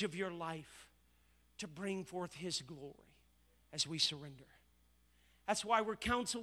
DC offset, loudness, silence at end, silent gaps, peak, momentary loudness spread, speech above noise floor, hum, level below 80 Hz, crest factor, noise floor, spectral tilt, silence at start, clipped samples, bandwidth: under 0.1%; -39 LUFS; 0 s; none; -18 dBFS; 20 LU; 32 dB; 60 Hz at -70 dBFS; -64 dBFS; 24 dB; -72 dBFS; -3 dB/octave; 0 s; under 0.1%; over 20 kHz